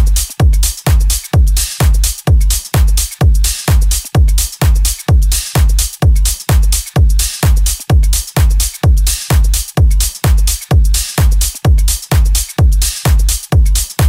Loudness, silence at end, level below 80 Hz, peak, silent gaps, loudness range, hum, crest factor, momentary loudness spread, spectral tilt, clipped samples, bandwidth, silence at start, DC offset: -13 LUFS; 0 s; -12 dBFS; 0 dBFS; none; 0 LU; none; 10 dB; 2 LU; -4 dB/octave; under 0.1%; 16.5 kHz; 0 s; under 0.1%